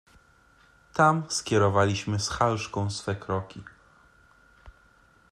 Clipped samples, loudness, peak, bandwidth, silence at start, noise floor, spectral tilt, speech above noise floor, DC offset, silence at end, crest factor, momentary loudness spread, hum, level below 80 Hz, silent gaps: under 0.1%; -26 LUFS; -8 dBFS; 12.5 kHz; 0.95 s; -60 dBFS; -5 dB/octave; 34 dB; under 0.1%; 0.6 s; 20 dB; 11 LU; none; -56 dBFS; none